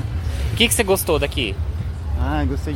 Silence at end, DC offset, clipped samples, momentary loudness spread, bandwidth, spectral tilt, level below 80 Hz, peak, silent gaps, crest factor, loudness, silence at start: 0 s; under 0.1%; under 0.1%; 10 LU; 17 kHz; -4 dB/octave; -26 dBFS; -2 dBFS; none; 18 dB; -20 LUFS; 0 s